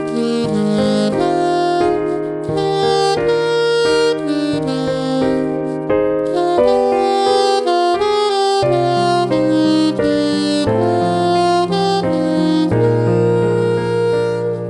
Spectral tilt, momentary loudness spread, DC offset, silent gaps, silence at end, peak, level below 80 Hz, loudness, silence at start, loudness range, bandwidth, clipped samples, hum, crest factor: -6 dB/octave; 4 LU; under 0.1%; none; 0 s; -2 dBFS; -46 dBFS; -15 LUFS; 0 s; 2 LU; 11.5 kHz; under 0.1%; none; 12 dB